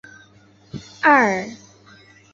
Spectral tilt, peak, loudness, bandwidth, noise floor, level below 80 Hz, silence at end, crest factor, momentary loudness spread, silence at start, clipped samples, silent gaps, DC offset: -5 dB/octave; -2 dBFS; -17 LUFS; 7.8 kHz; -52 dBFS; -60 dBFS; 0.8 s; 20 dB; 23 LU; 0.75 s; under 0.1%; none; under 0.1%